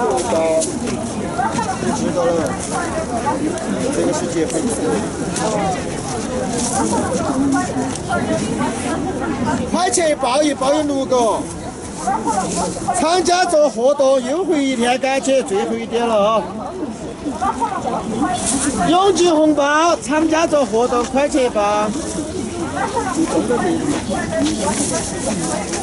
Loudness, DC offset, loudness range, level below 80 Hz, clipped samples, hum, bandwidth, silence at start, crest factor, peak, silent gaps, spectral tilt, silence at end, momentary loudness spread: -18 LUFS; under 0.1%; 4 LU; -40 dBFS; under 0.1%; none; 12 kHz; 0 s; 14 dB; -2 dBFS; none; -4 dB/octave; 0 s; 8 LU